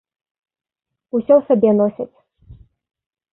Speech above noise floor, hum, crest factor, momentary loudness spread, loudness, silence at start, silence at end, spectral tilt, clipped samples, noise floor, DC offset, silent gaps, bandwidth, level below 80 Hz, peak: 30 dB; none; 18 dB; 16 LU; -16 LUFS; 1.15 s; 0.8 s; -13 dB/octave; under 0.1%; -45 dBFS; under 0.1%; none; 3.5 kHz; -56 dBFS; -2 dBFS